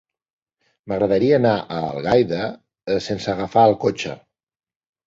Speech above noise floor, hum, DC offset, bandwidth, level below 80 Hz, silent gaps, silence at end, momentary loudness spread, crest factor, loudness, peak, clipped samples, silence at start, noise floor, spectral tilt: 51 dB; none; under 0.1%; 7.8 kHz; -52 dBFS; none; 0.9 s; 13 LU; 18 dB; -20 LUFS; -2 dBFS; under 0.1%; 0.85 s; -70 dBFS; -6.5 dB/octave